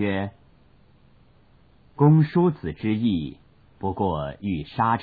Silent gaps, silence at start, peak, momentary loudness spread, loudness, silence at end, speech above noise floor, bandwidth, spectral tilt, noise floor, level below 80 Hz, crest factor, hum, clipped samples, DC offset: none; 0 s; -8 dBFS; 13 LU; -24 LUFS; 0 s; 35 dB; 4.8 kHz; -11.5 dB/octave; -57 dBFS; -50 dBFS; 16 dB; none; under 0.1%; under 0.1%